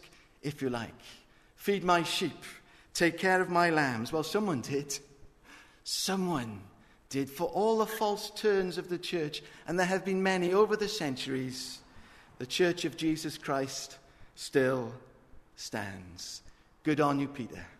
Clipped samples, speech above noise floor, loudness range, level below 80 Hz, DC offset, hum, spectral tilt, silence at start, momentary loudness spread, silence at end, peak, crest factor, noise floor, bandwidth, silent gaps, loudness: under 0.1%; 25 dB; 5 LU; -62 dBFS; under 0.1%; none; -4.5 dB/octave; 0.05 s; 16 LU; 0.05 s; -12 dBFS; 20 dB; -56 dBFS; 13.5 kHz; none; -31 LUFS